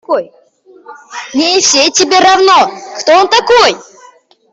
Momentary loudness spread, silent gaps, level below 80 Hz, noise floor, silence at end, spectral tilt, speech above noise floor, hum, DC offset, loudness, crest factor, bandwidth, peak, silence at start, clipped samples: 12 LU; none; -52 dBFS; -42 dBFS; 0.7 s; -0.5 dB/octave; 34 dB; none; under 0.1%; -8 LUFS; 10 dB; 8.4 kHz; 0 dBFS; 0.1 s; under 0.1%